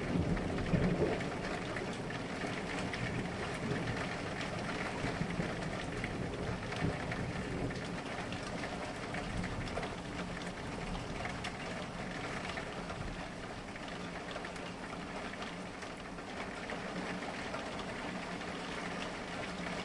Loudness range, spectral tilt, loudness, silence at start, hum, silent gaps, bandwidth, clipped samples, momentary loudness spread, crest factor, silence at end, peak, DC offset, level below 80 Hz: 5 LU; -5.5 dB/octave; -39 LUFS; 0 s; none; none; 11.5 kHz; under 0.1%; 6 LU; 20 dB; 0 s; -20 dBFS; under 0.1%; -52 dBFS